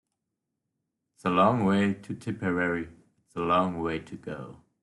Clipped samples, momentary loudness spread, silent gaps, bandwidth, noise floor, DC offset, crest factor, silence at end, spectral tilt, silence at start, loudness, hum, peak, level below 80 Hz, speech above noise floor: under 0.1%; 17 LU; none; 11.5 kHz; -84 dBFS; under 0.1%; 20 dB; 0.3 s; -7.5 dB/octave; 1.25 s; -27 LUFS; none; -10 dBFS; -62 dBFS; 57 dB